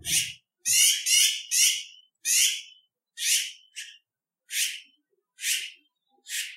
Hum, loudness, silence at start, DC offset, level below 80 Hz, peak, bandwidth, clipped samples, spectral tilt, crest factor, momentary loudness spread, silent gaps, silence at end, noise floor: none; -23 LUFS; 0.05 s; under 0.1%; -70 dBFS; -6 dBFS; 16 kHz; under 0.1%; 4 dB/octave; 22 dB; 21 LU; none; 0 s; -80 dBFS